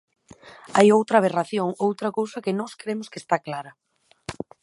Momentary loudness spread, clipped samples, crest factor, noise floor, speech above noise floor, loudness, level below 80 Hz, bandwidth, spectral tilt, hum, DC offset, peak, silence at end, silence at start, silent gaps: 19 LU; under 0.1%; 20 dB; -48 dBFS; 25 dB; -23 LUFS; -64 dBFS; 11.5 kHz; -5.5 dB/octave; none; under 0.1%; -4 dBFS; 0.3 s; 0.45 s; none